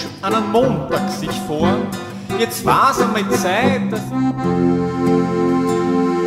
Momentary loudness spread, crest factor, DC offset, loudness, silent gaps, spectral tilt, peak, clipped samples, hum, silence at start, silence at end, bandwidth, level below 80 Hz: 7 LU; 16 dB; under 0.1%; -17 LUFS; none; -5.5 dB/octave; -2 dBFS; under 0.1%; none; 0 s; 0 s; 16 kHz; -46 dBFS